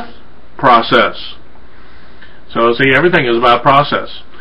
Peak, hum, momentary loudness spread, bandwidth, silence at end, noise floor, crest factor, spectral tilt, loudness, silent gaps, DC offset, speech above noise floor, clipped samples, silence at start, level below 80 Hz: 0 dBFS; none; 15 LU; 7.4 kHz; 0.2 s; -41 dBFS; 14 dB; -7 dB/octave; -11 LUFS; none; 6%; 30 dB; under 0.1%; 0 s; -42 dBFS